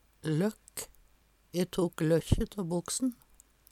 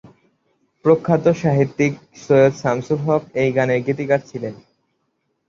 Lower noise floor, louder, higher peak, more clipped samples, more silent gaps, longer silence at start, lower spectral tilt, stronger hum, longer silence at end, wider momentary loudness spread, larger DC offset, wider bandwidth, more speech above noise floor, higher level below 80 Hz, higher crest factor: second, -65 dBFS vs -71 dBFS; second, -32 LUFS vs -18 LUFS; second, -10 dBFS vs -2 dBFS; neither; neither; second, 0.25 s vs 0.85 s; second, -5.5 dB/octave vs -7.5 dB/octave; neither; second, 0.6 s vs 0.95 s; first, 13 LU vs 8 LU; neither; first, 16 kHz vs 7.6 kHz; second, 34 dB vs 53 dB; first, -46 dBFS vs -56 dBFS; about the same, 22 dB vs 18 dB